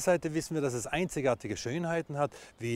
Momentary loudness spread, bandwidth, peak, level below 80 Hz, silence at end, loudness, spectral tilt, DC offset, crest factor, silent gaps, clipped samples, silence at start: 5 LU; 16 kHz; -14 dBFS; -58 dBFS; 0 s; -32 LUFS; -5 dB/octave; under 0.1%; 18 dB; none; under 0.1%; 0 s